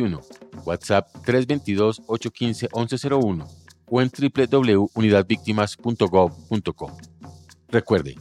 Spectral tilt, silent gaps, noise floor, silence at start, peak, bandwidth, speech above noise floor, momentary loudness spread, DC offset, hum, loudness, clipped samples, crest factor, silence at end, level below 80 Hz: -6.5 dB/octave; none; -45 dBFS; 0 s; -4 dBFS; 12.5 kHz; 23 dB; 11 LU; under 0.1%; none; -22 LUFS; under 0.1%; 18 dB; 0 s; -54 dBFS